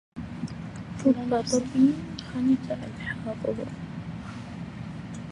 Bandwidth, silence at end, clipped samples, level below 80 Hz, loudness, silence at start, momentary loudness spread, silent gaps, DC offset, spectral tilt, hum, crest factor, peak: 11.5 kHz; 0 s; under 0.1%; -52 dBFS; -29 LUFS; 0.15 s; 15 LU; none; under 0.1%; -6 dB/octave; none; 18 dB; -10 dBFS